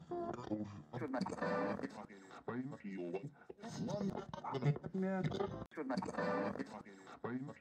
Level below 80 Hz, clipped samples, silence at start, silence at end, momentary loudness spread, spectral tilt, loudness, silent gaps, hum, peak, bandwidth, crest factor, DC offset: -70 dBFS; under 0.1%; 0 s; 0 s; 11 LU; -7 dB/octave; -42 LUFS; 5.67-5.71 s; none; -24 dBFS; 10 kHz; 18 dB; under 0.1%